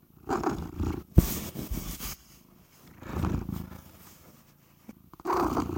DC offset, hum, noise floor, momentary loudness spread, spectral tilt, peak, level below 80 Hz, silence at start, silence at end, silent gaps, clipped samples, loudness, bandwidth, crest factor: under 0.1%; none; -59 dBFS; 25 LU; -6 dB/octave; -4 dBFS; -38 dBFS; 0.25 s; 0 s; none; under 0.1%; -31 LUFS; 16.5 kHz; 28 dB